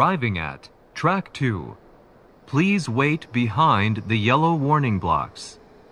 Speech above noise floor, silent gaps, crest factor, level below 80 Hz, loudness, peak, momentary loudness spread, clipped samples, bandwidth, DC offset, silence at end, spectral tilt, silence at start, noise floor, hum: 30 dB; none; 18 dB; -50 dBFS; -22 LUFS; -4 dBFS; 15 LU; under 0.1%; 10.5 kHz; under 0.1%; 0.4 s; -6.5 dB/octave; 0 s; -51 dBFS; none